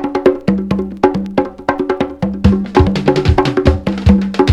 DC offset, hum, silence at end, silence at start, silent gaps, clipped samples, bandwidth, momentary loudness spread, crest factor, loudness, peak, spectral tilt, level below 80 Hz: under 0.1%; none; 0 s; 0 s; none; 0.2%; 9.6 kHz; 6 LU; 14 dB; -14 LUFS; 0 dBFS; -8 dB/octave; -24 dBFS